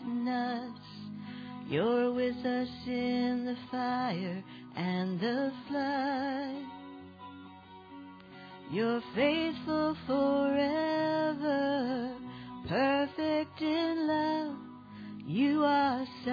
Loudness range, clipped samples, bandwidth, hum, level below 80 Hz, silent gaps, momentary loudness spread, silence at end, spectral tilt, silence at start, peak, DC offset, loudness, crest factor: 5 LU; under 0.1%; 5 kHz; none; -68 dBFS; none; 20 LU; 0 s; -7.5 dB/octave; 0 s; -16 dBFS; under 0.1%; -32 LUFS; 16 dB